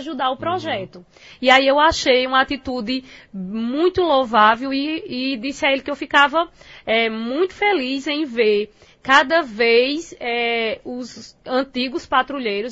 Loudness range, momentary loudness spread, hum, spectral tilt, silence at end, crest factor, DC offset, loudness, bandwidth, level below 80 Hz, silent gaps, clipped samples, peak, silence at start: 2 LU; 14 LU; none; -3.5 dB/octave; 0 s; 20 dB; under 0.1%; -19 LUFS; 8 kHz; -50 dBFS; none; under 0.1%; 0 dBFS; 0 s